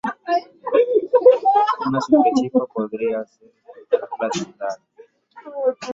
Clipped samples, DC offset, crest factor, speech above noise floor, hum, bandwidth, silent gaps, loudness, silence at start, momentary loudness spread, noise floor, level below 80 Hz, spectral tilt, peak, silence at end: under 0.1%; under 0.1%; 18 dB; 25 dB; none; 7.8 kHz; none; -19 LUFS; 0.05 s; 15 LU; -46 dBFS; -66 dBFS; -5.5 dB/octave; -2 dBFS; 0 s